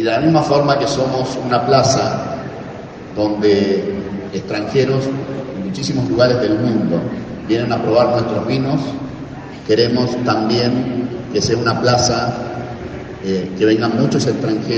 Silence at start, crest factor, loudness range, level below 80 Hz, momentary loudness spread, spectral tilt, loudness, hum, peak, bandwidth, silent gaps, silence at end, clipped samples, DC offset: 0 s; 16 dB; 2 LU; -44 dBFS; 13 LU; -5.5 dB/octave; -17 LUFS; none; 0 dBFS; 9 kHz; none; 0 s; under 0.1%; under 0.1%